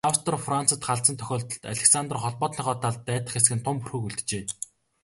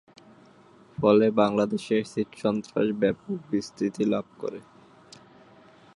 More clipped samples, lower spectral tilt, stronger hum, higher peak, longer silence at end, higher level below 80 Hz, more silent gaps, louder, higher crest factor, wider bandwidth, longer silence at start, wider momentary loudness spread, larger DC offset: neither; second, -3 dB/octave vs -6.5 dB/octave; neither; first, -2 dBFS vs -6 dBFS; second, 0.4 s vs 1.35 s; first, -58 dBFS vs -64 dBFS; neither; about the same, -25 LUFS vs -26 LUFS; about the same, 24 dB vs 20 dB; about the same, 12 kHz vs 11 kHz; second, 0.05 s vs 1 s; second, 11 LU vs 16 LU; neither